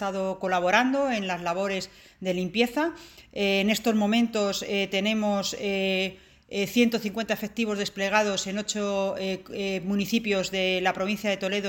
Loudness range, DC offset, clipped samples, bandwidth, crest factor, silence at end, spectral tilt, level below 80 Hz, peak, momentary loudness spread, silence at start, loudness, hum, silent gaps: 2 LU; under 0.1%; under 0.1%; 17 kHz; 20 dB; 0 s; -4 dB/octave; -60 dBFS; -6 dBFS; 8 LU; 0 s; -26 LUFS; none; none